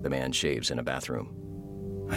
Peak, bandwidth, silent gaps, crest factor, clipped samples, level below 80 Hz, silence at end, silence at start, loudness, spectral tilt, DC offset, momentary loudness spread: -14 dBFS; 17 kHz; none; 18 dB; under 0.1%; -50 dBFS; 0 s; 0 s; -31 LUFS; -4 dB/octave; under 0.1%; 13 LU